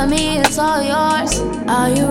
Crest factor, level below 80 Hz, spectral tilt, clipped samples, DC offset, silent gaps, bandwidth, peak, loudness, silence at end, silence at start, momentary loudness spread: 16 dB; -32 dBFS; -3.5 dB/octave; under 0.1%; under 0.1%; none; 16.5 kHz; 0 dBFS; -16 LUFS; 0 s; 0 s; 4 LU